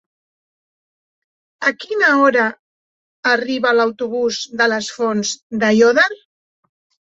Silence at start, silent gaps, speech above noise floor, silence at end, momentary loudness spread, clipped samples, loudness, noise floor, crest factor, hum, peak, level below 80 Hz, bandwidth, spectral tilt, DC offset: 1.6 s; 2.59-3.23 s, 5.42-5.50 s; over 74 dB; 0.9 s; 9 LU; under 0.1%; -16 LUFS; under -90 dBFS; 16 dB; none; -2 dBFS; -64 dBFS; 8 kHz; -3.5 dB/octave; under 0.1%